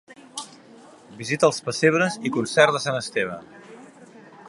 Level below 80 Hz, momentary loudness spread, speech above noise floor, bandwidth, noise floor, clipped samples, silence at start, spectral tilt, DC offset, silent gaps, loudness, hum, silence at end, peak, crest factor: -68 dBFS; 18 LU; 26 dB; 11.5 kHz; -48 dBFS; under 0.1%; 0.1 s; -4 dB/octave; under 0.1%; none; -22 LUFS; none; 0 s; 0 dBFS; 24 dB